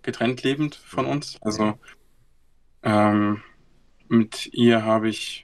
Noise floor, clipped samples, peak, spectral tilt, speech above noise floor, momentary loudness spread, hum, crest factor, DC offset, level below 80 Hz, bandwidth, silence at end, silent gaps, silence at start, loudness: -56 dBFS; under 0.1%; -6 dBFS; -6 dB/octave; 34 dB; 9 LU; none; 18 dB; under 0.1%; -58 dBFS; 12.5 kHz; 0 s; none; 0.05 s; -23 LUFS